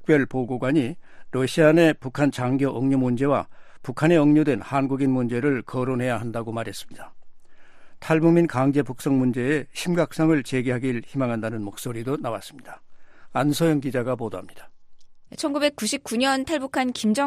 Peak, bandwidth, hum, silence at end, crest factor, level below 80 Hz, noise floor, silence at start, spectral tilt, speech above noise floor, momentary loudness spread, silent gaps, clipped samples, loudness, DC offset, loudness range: -4 dBFS; 15 kHz; none; 0 s; 20 dB; -56 dBFS; -42 dBFS; 0 s; -6 dB/octave; 20 dB; 13 LU; none; under 0.1%; -23 LUFS; under 0.1%; 6 LU